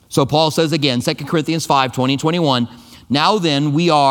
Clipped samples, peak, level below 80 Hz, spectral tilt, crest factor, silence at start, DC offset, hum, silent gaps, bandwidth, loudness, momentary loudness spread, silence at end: under 0.1%; 0 dBFS; -52 dBFS; -5 dB/octave; 16 dB; 0.1 s; under 0.1%; none; none; 18 kHz; -16 LUFS; 5 LU; 0 s